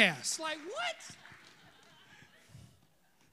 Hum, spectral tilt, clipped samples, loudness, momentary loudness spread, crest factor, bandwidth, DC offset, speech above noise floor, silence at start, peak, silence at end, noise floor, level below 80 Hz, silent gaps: none; -2 dB/octave; under 0.1%; -35 LUFS; 24 LU; 28 dB; 15.5 kHz; under 0.1%; 35 dB; 0 s; -10 dBFS; 0.7 s; -69 dBFS; -78 dBFS; none